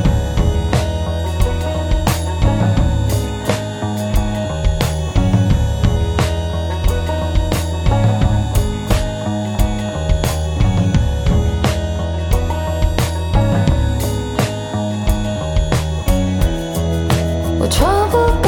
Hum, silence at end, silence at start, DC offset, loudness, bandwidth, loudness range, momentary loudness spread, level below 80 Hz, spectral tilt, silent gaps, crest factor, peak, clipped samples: none; 0 s; 0 s; under 0.1%; -17 LUFS; 18.5 kHz; 1 LU; 5 LU; -20 dBFS; -6 dB/octave; none; 16 dB; 0 dBFS; under 0.1%